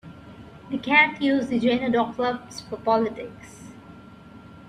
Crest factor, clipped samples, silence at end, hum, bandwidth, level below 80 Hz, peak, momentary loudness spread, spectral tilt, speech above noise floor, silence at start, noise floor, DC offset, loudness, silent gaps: 20 dB; under 0.1%; 0 s; none; 11 kHz; -58 dBFS; -4 dBFS; 26 LU; -5 dB/octave; 22 dB; 0.05 s; -45 dBFS; under 0.1%; -22 LUFS; none